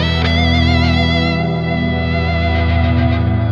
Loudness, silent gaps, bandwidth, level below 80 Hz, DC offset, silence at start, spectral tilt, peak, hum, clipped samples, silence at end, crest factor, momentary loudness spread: -15 LUFS; none; 7.2 kHz; -22 dBFS; under 0.1%; 0 s; -7 dB/octave; 0 dBFS; none; under 0.1%; 0 s; 12 dB; 4 LU